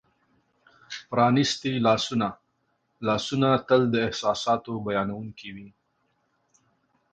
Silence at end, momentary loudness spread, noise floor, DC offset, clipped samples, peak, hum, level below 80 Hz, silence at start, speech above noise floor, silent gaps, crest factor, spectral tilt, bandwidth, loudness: 1.45 s; 18 LU; -73 dBFS; under 0.1%; under 0.1%; -8 dBFS; none; -60 dBFS; 0.9 s; 48 dB; none; 20 dB; -5.5 dB/octave; 9.2 kHz; -25 LUFS